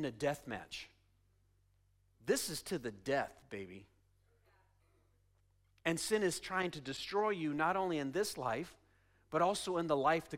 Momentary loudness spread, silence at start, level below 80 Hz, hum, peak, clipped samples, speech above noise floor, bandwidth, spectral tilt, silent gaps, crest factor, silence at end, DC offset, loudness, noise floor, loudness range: 14 LU; 0 s; -70 dBFS; none; -20 dBFS; under 0.1%; 36 dB; 16 kHz; -4 dB/octave; none; 20 dB; 0 s; under 0.1%; -37 LUFS; -73 dBFS; 7 LU